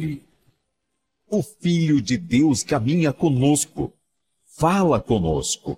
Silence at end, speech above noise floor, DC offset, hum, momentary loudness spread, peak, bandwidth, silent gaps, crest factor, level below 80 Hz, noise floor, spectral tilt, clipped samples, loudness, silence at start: 0 s; 57 dB; under 0.1%; none; 8 LU; -6 dBFS; 15.5 kHz; none; 16 dB; -44 dBFS; -78 dBFS; -5.5 dB/octave; under 0.1%; -21 LUFS; 0 s